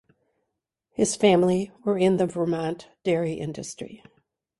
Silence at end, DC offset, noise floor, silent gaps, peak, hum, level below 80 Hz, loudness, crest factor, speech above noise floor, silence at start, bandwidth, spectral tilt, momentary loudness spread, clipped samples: 0.65 s; under 0.1%; -81 dBFS; none; -6 dBFS; none; -62 dBFS; -24 LUFS; 20 dB; 57 dB; 1 s; 11.5 kHz; -5.5 dB/octave; 17 LU; under 0.1%